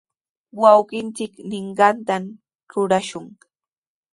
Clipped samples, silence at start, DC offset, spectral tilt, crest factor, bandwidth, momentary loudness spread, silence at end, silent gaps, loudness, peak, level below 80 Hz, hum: under 0.1%; 0.55 s; under 0.1%; -5 dB/octave; 20 dB; 11.5 kHz; 19 LU; 0.85 s; 2.55-2.59 s; -19 LUFS; 0 dBFS; -68 dBFS; none